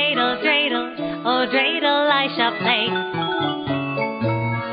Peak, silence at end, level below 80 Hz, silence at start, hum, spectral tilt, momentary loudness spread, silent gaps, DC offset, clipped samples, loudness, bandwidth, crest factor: -4 dBFS; 0 s; -56 dBFS; 0 s; none; -10 dB/octave; 7 LU; none; under 0.1%; under 0.1%; -20 LUFS; 5.2 kHz; 16 dB